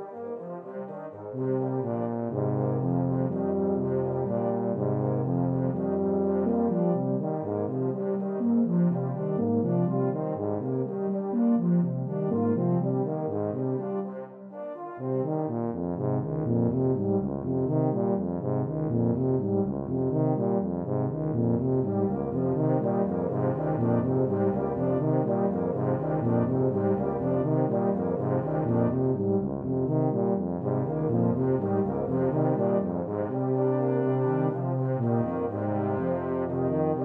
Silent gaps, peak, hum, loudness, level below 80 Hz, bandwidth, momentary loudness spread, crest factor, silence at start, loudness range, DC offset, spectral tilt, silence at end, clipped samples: none; -10 dBFS; none; -27 LUFS; -58 dBFS; 3.1 kHz; 5 LU; 16 dB; 0 s; 2 LU; under 0.1%; -13.5 dB/octave; 0 s; under 0.1%